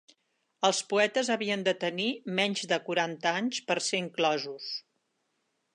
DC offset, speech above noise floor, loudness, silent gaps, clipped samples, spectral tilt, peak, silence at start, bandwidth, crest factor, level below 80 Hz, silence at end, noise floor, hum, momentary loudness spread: under 0.1%; 48 dB; -29 LUFS; none; under 0.1%; -3 dB/octave; -10 dBFS; 0.6 s; 11.5 kHz; 20 dB; -84 dBFS; 0.95 s; -78 dBFS; none; 6 LU